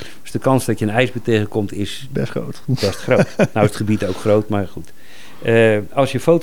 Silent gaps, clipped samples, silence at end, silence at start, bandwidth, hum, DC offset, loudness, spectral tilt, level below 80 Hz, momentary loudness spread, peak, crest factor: none; under 0.1%; 0 s; 0 s; 19 kHz; none; 4%; -18 LUFS; -6.5 dB/octave; -50 dBFS; 10 LU; 0 dBFS; 18 dB